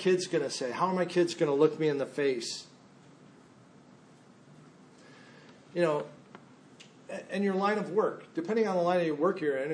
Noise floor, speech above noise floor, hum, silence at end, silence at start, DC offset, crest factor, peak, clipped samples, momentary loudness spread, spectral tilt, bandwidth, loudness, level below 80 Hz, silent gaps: -57 dBFS; 28 dB; none; 0 s; 0 s; under 0.1%; 20 dB; -12 dBFS; under 0.1%; 11 LU; -5.5 dB/octave; 10.5 kHz; -30 LUFS; -84 dBFS; none